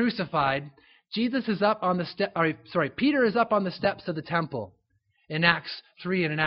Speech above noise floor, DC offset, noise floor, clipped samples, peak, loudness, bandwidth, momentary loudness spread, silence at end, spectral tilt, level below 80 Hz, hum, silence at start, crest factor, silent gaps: 44 dB; under 0.1%; -71 dBFS; under 0.1%; -2 dBFS; -26 LUFS; 5.8 kHz; 12 LU; 0 s; -3.5 dB/octave; -64 dBFS; none; 0 s; 24 dB; none